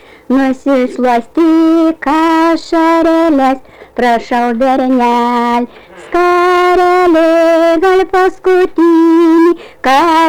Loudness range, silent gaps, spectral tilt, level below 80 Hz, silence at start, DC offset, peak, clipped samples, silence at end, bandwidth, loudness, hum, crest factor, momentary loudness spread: 3 LU; none; -4.5 dB/octave; -42 dBFS; 0.3 s; under 0.1%; -4 dBFS; under 0.1%; 0 s; 13 kHz; -10 LUFS; none; 6 dB; 6 LU